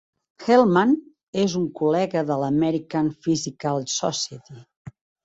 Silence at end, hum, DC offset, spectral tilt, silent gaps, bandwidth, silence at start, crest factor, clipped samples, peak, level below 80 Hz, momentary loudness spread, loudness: 0.35 s; none; under 0.1%; -5 dB/octave; 1.23-1.33 s, 4.76-4.85 s; 8 kHz; 0.4 s; 20 dB; under 0.1%; -4 dBFS; -62 dBFS; 12 LU; -22 LUFS